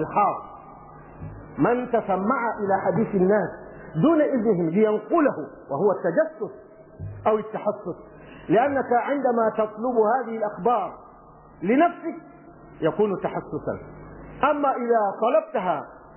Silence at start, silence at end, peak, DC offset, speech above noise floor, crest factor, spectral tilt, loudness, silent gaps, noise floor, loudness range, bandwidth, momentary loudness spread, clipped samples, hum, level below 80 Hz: 0 s; 0.05 s; -8 dBFS; under 0.1%; 26 dB; 16 dB; -11 dB/octave; -23 LUFS; none; -48 dBFS; 4 LU; 3.2 kHz; 16 LU; under 0.1%; none; -56 dBFS